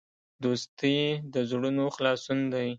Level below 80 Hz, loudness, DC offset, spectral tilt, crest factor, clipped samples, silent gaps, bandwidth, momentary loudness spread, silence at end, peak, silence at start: -72 dBFS; -29 LUFS; under 0.1%; -5.5 dB/octave; 16 dB; under 0.1%; 0.68-0.77 s; 7.8 kHz; 4 LU; 0 s; -12 dBFS; 0.4 s